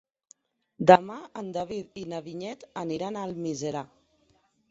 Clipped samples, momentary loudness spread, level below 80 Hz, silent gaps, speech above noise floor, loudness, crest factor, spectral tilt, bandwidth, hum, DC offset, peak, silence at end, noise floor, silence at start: under 0.1%; 19 LU; -68 dBFS; none; 41 dB; -27 LUFS; 26 dB; -5.5 dB/octave; 8 kHz; none; under 0.1%; -2 dBFS; 0.85 s; -68 dBFS; 0.8 s